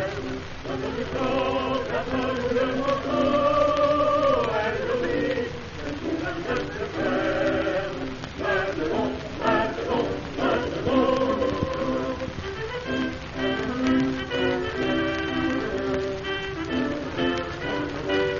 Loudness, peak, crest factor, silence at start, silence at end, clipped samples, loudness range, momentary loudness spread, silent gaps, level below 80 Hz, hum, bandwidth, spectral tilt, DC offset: -26 LUFS; -8 dBFS; 16 dB; 0 s; 0 s; under 0.1%; 4 LU; 9 LU; none; -44 dBFS; none; 7.2 kHz; -4 dB/octave; under 0.1%